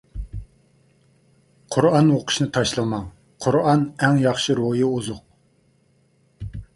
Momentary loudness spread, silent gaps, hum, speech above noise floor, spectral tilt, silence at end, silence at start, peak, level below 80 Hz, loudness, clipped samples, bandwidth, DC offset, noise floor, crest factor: 19 LU; none; none; 42 dB; -5.5 dB/octave; 0.1 s; 0.15 s; -2 dBFS; -44 dBFS; -20 LUFS; under 0.1%; 11.5 kHz; under 0.1%; -61 dBFS; 20 dB